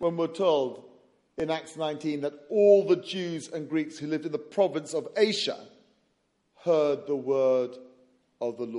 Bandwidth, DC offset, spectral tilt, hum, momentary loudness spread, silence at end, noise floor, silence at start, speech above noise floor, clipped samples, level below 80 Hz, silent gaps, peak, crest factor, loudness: 11.5 kHz; under 0.1%; -5 dB/octave; none; 12 LU; 0 s; -73 dBFS; 0 s; 46 dB; under 0.1%; -72 dBFS; none; -8 dBFS; 20 dB; -27 LUFS